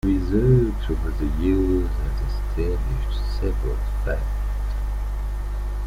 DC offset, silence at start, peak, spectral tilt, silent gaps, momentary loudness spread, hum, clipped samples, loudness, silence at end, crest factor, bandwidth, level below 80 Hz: under 0.1%; 0.05 s; -6 dBFS; -8.5 dB/octave; none; 9 LU; 50 Hz at -25 dBFS; under 0.1%; -25 LUFS; 0 s; 16 dB; 10.5 kHz; -24 dBFS